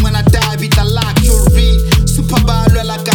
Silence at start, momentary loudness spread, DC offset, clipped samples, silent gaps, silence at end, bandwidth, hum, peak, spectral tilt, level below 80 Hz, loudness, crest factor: 0 s; 3 LU; under 0.1%; under 0.1%; none; 0 s; 19 kHz; none; 0 dBFS; -5 dB/octave; -14 dBFS; -11 LUFS; 10 dB